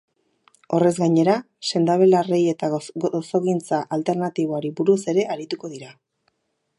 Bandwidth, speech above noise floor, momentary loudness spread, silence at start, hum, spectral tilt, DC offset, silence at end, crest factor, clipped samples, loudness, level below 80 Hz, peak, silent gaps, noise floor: 11.5 kHz; 50 dB; 10 LU; 0.7 s; none; -6.5 dB/octave; under 0.1%; 0.85 s; 16 dB; under 0.1%; -21 LUFS; -70 dBFS; -4 dBFS; none; -70 dBFS